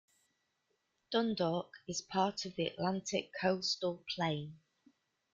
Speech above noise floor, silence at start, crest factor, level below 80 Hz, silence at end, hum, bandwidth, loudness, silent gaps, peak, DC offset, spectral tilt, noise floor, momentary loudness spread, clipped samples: 45 dB; 1.1 s; 20 dB; -74 dBFS; 0.8 s; none; 9.2 kHz; -36 LUFS; none; -18 dBFS; under 0.1%; -4.5 dB/octave; -82 dBFS; 7 LU; under 0.1%